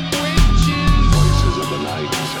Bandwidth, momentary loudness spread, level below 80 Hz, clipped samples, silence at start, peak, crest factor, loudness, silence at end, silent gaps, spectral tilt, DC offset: 17 kHz; 7 LU; -18 dBFS; under 0.1%; 0 s; 0 dBFS; 14 dB; -17 LUFS; 0 s; none; -5 dB/octave; under 0.1%